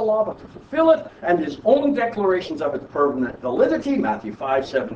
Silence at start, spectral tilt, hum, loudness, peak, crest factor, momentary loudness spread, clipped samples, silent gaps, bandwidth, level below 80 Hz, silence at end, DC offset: 0 s; -7 dB/octave; none; -21 LUFS; -4 dBFS; 18 dB; 8 LU; under 0.1%; none; 8 kHz; -54 dBFS; 0 s; under 0.1%